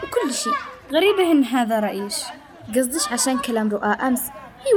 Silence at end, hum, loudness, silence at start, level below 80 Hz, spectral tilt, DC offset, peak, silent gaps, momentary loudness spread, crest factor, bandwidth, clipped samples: 0 s; none; -21 LUFS; 0 s; -58 dBFS; -3 dB/octave; under 0.1%; -8 dBFS; none; 10 LU; 14 dB; over 20 kHz; under 0.1%